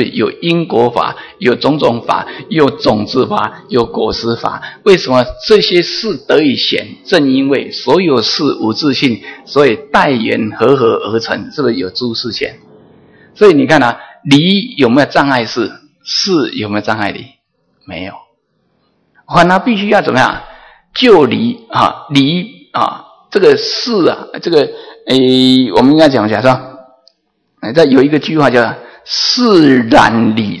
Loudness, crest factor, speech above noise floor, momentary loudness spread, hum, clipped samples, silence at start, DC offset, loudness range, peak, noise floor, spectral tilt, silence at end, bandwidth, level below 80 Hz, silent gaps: -11 LUFS; 12 dB; 50 dB; 10 LU; none; 1%; 0 s; under 0.1%; 4 LU; 0 dBFS; -61 dBFS; -5.5 dB/octave; 0 s; 11 kHz; -44 dBFS; none